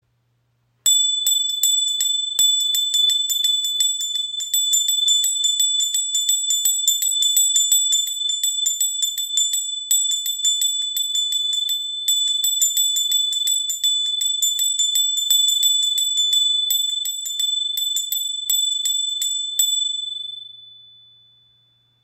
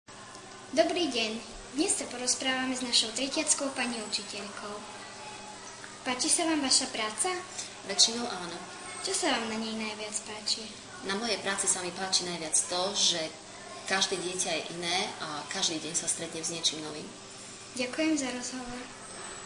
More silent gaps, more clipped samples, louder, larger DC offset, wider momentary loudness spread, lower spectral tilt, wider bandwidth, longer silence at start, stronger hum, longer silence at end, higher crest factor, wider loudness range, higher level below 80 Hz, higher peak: neither; neither; first, -17 LUFS vs -29 LUFS; neither; second, 6 LU vs 17 LU; second, 6 dB/octave vs -1 dB/octave; first, 16.5 kHz vs 10.5 kHz; first, 0.85 s vs 0.1 s; neither; first, 1.3 s vs 0 s; second, 16 dB vs 24 dB; about the same, 3 LU vs 4 LU; second, -76 dBFS vs -64 dBFS; first, -4 dBFS vs -8 dBFS